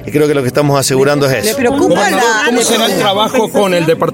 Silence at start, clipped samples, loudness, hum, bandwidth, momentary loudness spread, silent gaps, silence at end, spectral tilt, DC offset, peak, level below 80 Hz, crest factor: 0 s; under 0.1%; -11 LUFS; none; 17 kHz; 2 LU; none; 0 s; -4 dB/octave; under 0.1%; 0 dBFS; -46 dBFS; 12 dB